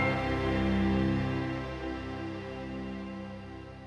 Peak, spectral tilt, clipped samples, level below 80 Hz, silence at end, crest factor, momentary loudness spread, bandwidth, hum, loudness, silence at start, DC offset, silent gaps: -18 dBFS; -7.5 dB/octave; under 0.1%; -44 dBFS; 0 s; 14 dB; 13 LU; 10 kHz; none; -33 LUFS; 0 s; under 0.1%; none